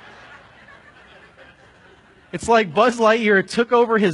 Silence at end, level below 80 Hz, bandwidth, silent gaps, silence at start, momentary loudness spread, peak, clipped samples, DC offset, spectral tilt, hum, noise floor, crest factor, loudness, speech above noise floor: 0 s; -56 dBFS; 11 kHz; none; 2.35 s; 6 LU; -2 dBFS; under 0.1%; under 0.1%; -5 dB/octave; none; -50 dBFS; 18 dB; -17 LUFS; 33 dB